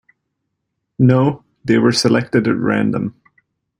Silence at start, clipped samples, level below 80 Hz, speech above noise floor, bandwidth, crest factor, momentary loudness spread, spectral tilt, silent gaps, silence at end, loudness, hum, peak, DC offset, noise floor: 1 s; under 0.1%; -52 dBFS; 60 dB; 11.5 kHz; 16 dB; 9 LU; -6 dB/octave; none; 0.7 s; -16 LUFS; none; -2 dBFS; under 0.1%; -75 dBFS